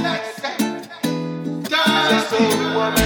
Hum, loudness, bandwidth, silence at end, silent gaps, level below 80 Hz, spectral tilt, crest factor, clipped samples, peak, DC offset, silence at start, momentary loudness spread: none; -19 LUFS; over 20 kHz; 0 s; none; -54 dBFS; -4 dB/octave; 16 dB; under 0.1%; -4 dBFS; under 0.1%; 0 s; 10 LU